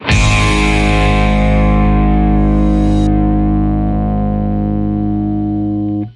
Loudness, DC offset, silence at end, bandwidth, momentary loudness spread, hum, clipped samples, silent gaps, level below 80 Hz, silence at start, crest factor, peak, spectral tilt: -13 LUFS; under 0.1%; 0.05 s; 11 kHz; 5 LU; none; under 0.1%; none; -16 dBFS; 0 s; 12 dB; 0 dBFS; -6.5 dB/octave